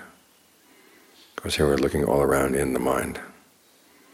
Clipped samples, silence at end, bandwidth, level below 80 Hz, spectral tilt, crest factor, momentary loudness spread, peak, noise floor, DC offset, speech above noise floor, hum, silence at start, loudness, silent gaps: under 0.1%; 0.8 s; 17 kHz; -44 dBFS; -5 dB/octave; 18 dB; 17 LU; -8 dBFS; -58 dBFS; under 0.1%; 35 dB; none; 0 s; -24 LUFS; none